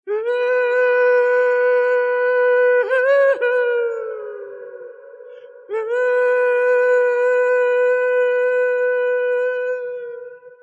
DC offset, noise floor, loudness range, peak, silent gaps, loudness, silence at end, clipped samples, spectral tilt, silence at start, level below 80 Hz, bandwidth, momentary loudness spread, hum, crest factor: under 0.1%; -39 dBFS; 5 LU; -8 dBFS; none; -17 LUFS; 0.1 s; under 0.1%; -2 dB/octave; 0.05 s; under -90 dBFS; 7.4 kHz; 14 LU; none; 10 dB